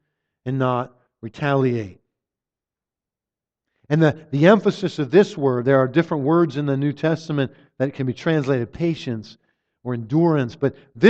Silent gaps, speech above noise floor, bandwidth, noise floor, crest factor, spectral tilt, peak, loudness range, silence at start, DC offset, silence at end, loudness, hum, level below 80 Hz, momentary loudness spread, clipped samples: none; 69 dB; 8 kHz; -89 dBFS; 20 dB; -8 dB/octave; 0 dBFS; 8 LU; 0.45 s; under 0.1%; 0 s; -21 LUFS; none; -60 dBFS; 12 LU; under 0.1%